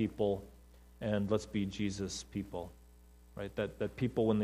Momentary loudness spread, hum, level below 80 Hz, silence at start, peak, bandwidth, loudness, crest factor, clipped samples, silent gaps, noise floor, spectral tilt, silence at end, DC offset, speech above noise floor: 12 LU; none; -56 dBFS; 0 s; -18 dBFS; 15 kHz; -37 LUFS; 20 dB; under 0.1%; none; -59 dBFS; -6 dB/octave; 0 s; under 0.1%; 24 dB